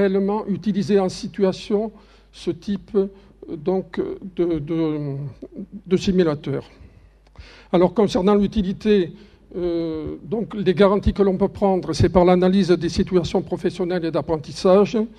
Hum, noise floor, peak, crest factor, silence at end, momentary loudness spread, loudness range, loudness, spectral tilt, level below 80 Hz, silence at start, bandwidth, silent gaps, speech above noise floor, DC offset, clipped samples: none; -50 dBFS; 0 dBFS; 20 dB; 0.05 s; 12 LU; 7 LU; -21 LUFS; -7 dB/octave; -40 dBFS; 0 s; 10 kHz; none; 30 dB; under 0.1%; under 0.1%